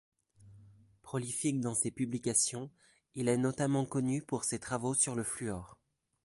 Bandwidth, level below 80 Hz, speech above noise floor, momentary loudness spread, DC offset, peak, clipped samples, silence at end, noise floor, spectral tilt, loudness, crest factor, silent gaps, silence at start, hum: 12 kHz; -66 dBFS; 26 dB; 11 LU; under 0.1%; -16 dBFS; under 0.1%; 0.5 s; -60 dBFS; -4.5 dB/octave; -33 LUFS; 20 dB; none; 0.4 s; none